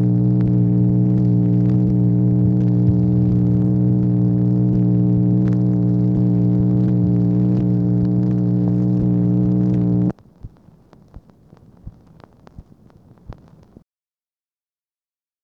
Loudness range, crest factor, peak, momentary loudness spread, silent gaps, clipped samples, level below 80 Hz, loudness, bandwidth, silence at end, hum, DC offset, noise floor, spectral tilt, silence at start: 5 LU; 12 dB; -6 dBFS; 2 LU; none; under 0.1%; -38 dBFS; -17 LUFS; 2 kHz; 2.1 s; none; under 0.1%; under -90 dBFS; -13 dB/octave; 0 s